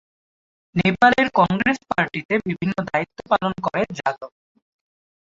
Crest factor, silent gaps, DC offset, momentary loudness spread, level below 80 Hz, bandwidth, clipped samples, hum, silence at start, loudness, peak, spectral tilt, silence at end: 20 dB; 2.25-2.29 s; under 0.1%; 11 LU; -54 dBFS; 7.8 kHz; under 0.1%; none; 0.75 s; -21 LUFS; -2 dBFS; -6.5 dB/octave; 1.05 s